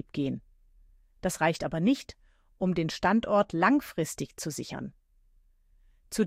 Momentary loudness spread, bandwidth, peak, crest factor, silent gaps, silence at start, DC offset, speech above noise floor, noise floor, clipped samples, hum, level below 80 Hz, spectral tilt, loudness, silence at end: 14 LU; 16 kHz; -10 dBFS; 20 dB; none; 0.15 s; under 0.1%; 35 dB; -63 dBFS; under 0.1%; none; -56 dBFS; -5.5 dB/octave; -29 LUFS; 0 s